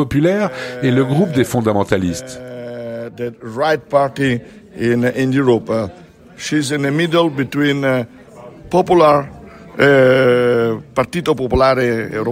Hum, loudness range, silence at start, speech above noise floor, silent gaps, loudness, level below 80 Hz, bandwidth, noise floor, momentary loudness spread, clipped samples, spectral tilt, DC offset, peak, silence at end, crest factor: none; 5 LU; 0 s; 22 dB; none; -16 LUFS; -42 dBFS; 16 kHz; -37 dBFS; 16 LU; under 0.1%; -6 dB/octave; under 0.1%; 0 dBFS; 0 s; 16 dB